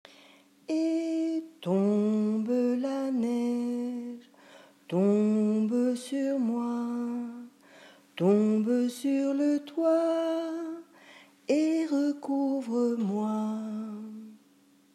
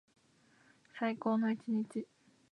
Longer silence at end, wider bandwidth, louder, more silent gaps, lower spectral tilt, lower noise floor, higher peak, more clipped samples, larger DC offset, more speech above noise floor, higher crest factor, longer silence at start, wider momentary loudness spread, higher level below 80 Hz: first, 0.6 s vs 0.45 s; first, 13.5 kHz vs 10 kHz; first, -29 LUFS vs -36 LUFS; neither; about the same, -7 dB/octave vs -7.5 dB/octave; second, -62 dBFS vs -69 dBFS; first, -14 dBFS vs -20 dBFS; neither; neither; about the same, 36 dB vs 34 dB; about the same, 14 dB vs 18 dB; second, 0.7 s vs 0.95 s; second, 13 LU vs 17 LU; about the same, -88 dBFS vs under -90 dBFS